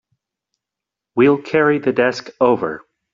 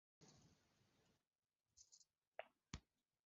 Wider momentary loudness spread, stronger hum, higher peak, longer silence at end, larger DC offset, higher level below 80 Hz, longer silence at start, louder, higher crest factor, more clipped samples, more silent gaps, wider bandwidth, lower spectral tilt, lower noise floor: first, 11 LU vs 8 LU; neither; first, -2 dBFS vs -34 dBFS; about the same, 0.35 s vs 0.4 s; neither; first, -60 dBFS vs -74 dBFS; first, 1.15 s vs 0.2 s; first, -17 LUFS vs -62 LUFS; second, 16 dB vs 32 dB; neither; second, none vs 1.27-1.31 s, 2.27-2.32 s; about the same, 7.4 kHz vs 7.6 kHz; first, -6.5 dB/octave vs -3.5 dB/octave; about the same, -85 dBFS vs -84 dBFS